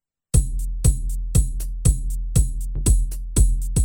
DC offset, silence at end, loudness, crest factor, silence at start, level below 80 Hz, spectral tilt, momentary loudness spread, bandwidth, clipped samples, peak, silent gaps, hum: under 0.1%; 0 s; -23 LUFS; 16 dB; 0.35 s; -20 dBFS; -5.5 dB/octave; 6 LU; 18.5 kHz; under 0.1%; -4 dBFS; none; none